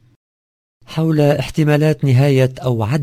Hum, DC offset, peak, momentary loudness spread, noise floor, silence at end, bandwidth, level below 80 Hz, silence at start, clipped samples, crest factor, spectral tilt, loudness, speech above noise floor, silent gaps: none; under 0.1%; 0 dBFS; 7 LU; under -90 dBFS; 0 s; 16 kHz; -44 dBFS; 0.9 s; under 0.1%; 16 dB; -7.5 dB/octave; -15 LUFS; over 76 dB; none